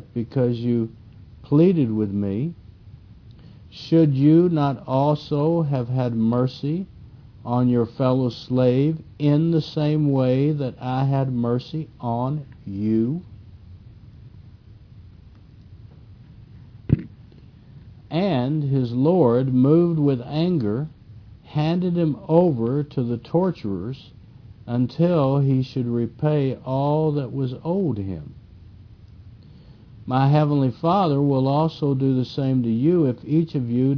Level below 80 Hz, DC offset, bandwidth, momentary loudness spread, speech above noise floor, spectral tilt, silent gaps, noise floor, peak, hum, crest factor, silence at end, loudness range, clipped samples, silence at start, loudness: -52 dBFS; under 0.1%; 5.4 kHz; 10 LU; 26 dB; -10 dB/octave; none; -46 dBFS; -4 dBFS; none; 18 dB; 0 s; 8 LU; under 0.1%; 0.15 s; -21 LUFS